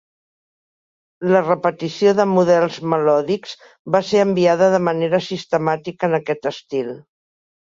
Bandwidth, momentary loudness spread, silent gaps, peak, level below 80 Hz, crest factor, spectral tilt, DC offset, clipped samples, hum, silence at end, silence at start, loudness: 7.6 kHz; 11 LU; 3.79-3.85 s; -2 dBFS; -64 dBFS; 16 dB; -6 dB/octave; under 0.1%; under 0.1%; none; 0.65 s; 1.2 s; -18 LUFS